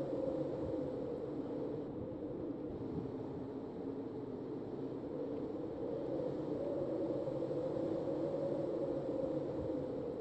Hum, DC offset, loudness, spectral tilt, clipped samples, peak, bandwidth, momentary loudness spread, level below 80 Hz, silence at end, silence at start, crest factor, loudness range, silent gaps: none; under 0.1%; -41 LUFS; -9.5 dB/octave; under 0.1%; -26 dBFS; 8.4 kHz; 6 LU; -64 dBFS; 0 s; 0 s; 14 dB; 5 LU; none